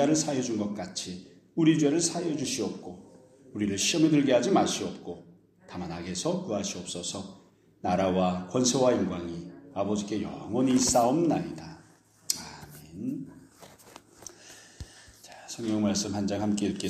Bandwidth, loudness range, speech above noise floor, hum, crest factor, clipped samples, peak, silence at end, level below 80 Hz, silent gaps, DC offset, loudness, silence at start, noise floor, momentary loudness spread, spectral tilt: 15.5 kHz; 12 LU; 31 dB; none; 22 dB; under 0.1%; -8 dBFS; 0 s; -60 dBFS; none; under 0.1%; -28 LUFS; 0 s; -58 dBFS; 23 LU; -4.5 dB/octave